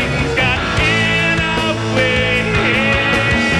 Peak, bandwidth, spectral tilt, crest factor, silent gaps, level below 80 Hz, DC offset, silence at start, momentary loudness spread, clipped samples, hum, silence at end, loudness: -2 dBFS; 13 kHz; -4.5 dB/octave; 12 dB; none; -30 dBFS; under 0.1%; 0 s; 3 LU; under 0.1%; none; 0 s; -14 LUFS